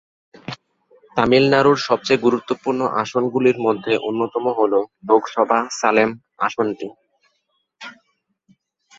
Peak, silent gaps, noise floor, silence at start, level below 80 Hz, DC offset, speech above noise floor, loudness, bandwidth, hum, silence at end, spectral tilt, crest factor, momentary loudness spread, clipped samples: -2 dBFS; none; -70 dBFS; 0.5 s; -60 dBFS; under 0.1%; 52 dB; -18 LUFS; 7.8 kHz; none; 1.05 s; -5 dB/octave; 18 dB; 19 LU; under 0.1%